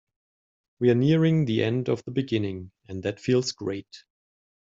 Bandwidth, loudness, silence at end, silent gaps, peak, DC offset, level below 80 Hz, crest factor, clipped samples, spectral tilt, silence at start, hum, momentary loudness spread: 7.8 kHz; -25 LUFS; 0.7 s; none; -8 dBFS; under 0.1%; -62 dBFS; 18 dB; under 0.1%; -7 dB/octave; 0.8 s; none; 12 LU